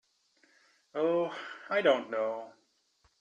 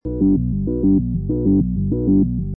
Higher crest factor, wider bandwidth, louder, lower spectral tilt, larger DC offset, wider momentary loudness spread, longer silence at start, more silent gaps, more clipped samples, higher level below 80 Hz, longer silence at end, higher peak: first, 20 dB vs 12 dB; first, 7.8 kHz vs 1.2 kHz; second, -31 LUFS vs -18 LUFS; second, -5.5 dB/octave vs -16 dB/octave; neither; first, 15 LU vs 4 LU; first, 0.95 s vs 0.05 s; neither; neither; second, -82 dBFS vs -28 dBFS; first, 0.7 s vs 0 s; second, -14 dBFS vs -6 dBFS